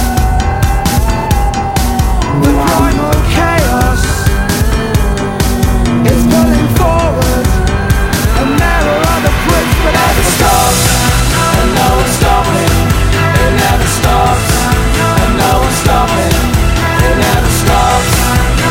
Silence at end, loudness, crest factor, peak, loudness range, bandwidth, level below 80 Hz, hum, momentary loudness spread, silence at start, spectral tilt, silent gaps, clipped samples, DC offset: 0 s; -10 LUFS; 10 dB; 0 dBFS; 2 LU; 17 kHz; -14 dBFS; none; 3 LU; 0 s; -4.5 dB/octave; none; under 0.1%; under 0.1%